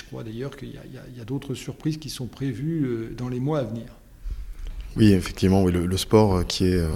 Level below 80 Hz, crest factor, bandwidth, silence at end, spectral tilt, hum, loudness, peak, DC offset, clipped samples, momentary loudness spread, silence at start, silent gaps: -38 dBFS; 22 dB; 16 kHz; 0 s; -6.5 dB/octave; none; -24 LUFS; -2 dBFS; under 0.1%; under 0.1%; 21 LU; 0 s; none